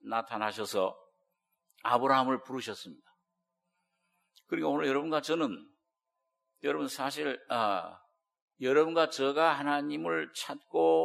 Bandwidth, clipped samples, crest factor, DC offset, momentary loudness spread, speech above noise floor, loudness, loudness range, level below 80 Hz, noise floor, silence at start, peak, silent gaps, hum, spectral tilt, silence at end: 15 kHz; under 0.1%; 22 dB; under 0.1%; 12 LU; 55 dB; -31 LUFS; 5 LU; -86 dBFS; -85 dBFS; 0.05 s; -10 dBFS; 8.42-8.48 s; none; -4 dB/octave; 0 s